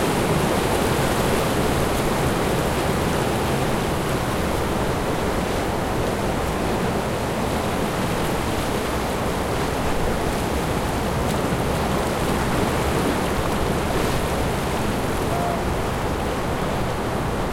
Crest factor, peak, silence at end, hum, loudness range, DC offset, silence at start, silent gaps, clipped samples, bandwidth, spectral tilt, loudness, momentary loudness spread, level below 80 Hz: 14 dB; -8 dBFS; 0 s; none; 2 LU; under 0.1%; 0 s; none; under 0.1%; 16 kHz; -5 dB/octave; -23 LUFS; 3 LU; -32 dBFS